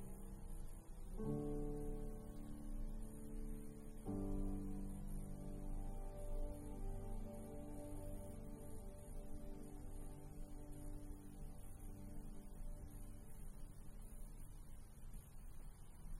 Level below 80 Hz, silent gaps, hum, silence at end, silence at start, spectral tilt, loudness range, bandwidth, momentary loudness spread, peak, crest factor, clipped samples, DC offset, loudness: -50 dBFS; none; none; 0 s; 0 s; -7.5 dB/octave; 8 LU; 16 kHz; 13 LU; -32 dBFS; 16 dB; under 0.1%; under 0.1%; -53 LUFS